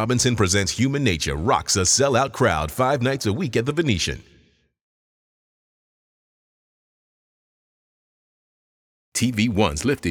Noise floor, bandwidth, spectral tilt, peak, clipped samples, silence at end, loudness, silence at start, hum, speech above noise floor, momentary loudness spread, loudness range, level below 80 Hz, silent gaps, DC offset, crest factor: -59 dBFS; 19.5 kHz; -4 dB/octave; -4 dBFS; under 0.1%; 0 s; -21 LUFS; 0 s; none; 38 dB; 6 LU; 11 LU; -44 dBFS; 4.81-9.12 s; under 0.1%; 18 dB